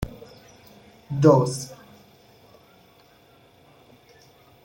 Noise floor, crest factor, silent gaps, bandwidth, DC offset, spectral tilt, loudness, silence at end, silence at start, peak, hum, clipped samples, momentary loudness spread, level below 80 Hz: -55 dBFS; 24 dB; none; 16.5 kHz; under 0.1%; -7 dB/octave; -21 LUFS; 2.9 s; 0 s; -4 dBFS; none; under 0.1%; 30 LU; -52 dBFS